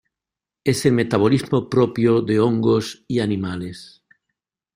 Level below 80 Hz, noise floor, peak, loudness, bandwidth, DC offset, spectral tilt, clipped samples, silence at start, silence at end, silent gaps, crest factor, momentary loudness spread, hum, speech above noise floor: -54 dBFS; -88 dBFS; -2 dBFS; -19 LUFS; 15.5 kHz; under 0.1%; -6.5 dB/octave; under 0.1%; 0.65 s; 0.9 s; none; 18 dB; 10 LU; none; 69 dB